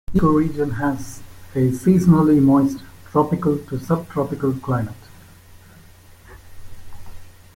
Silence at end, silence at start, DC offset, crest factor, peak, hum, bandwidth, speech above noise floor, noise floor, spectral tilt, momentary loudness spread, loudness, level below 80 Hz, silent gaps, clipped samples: 0.25 s; 0.1 s; under 0.1%; 16 dB; -4 dBFS; none; 16.5 kHz; 28 dB; -46 dBFS; -8.5 dB/octave; 15 LU; -19 LUFS; -42 dBFS; none; under 0.1%